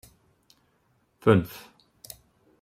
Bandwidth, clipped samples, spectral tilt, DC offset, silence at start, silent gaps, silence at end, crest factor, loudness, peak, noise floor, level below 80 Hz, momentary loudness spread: 16 kHz; under 0.1%; -7 dB/octave; under 0.1%; 1.25 s; none; 1.05 s; 24 dB; -23 LUFS; -6 dBFS; -69 dBFS; -60 dBFS; 24 LU